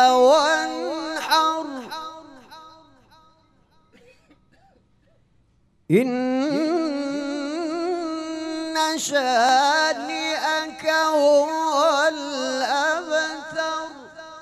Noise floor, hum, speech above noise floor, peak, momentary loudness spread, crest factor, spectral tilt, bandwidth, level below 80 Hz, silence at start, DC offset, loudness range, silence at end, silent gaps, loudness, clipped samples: -61 dBFS; none; 41 dB; -4 dBFS; 12 LU; 18 dB; -3 dB/octave; 14.5 kHz; -68 dBFS; 0 s; under 0.1%; 8 LU; 0 s; none; -21 LUFS; under 0.1%